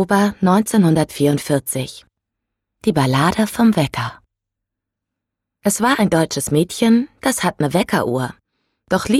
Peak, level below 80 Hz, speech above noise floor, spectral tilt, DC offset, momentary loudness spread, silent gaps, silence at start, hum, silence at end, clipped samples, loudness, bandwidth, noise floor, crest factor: -4 dBFS; -48 dBFS; 65 dB; -5.5 dB/octave; under 0.1%; 9 LU; none; 0 s; none; 0 s; under 0.1%; -17 LUFS; 15.5 kHz; -81 dBFS; 14 dB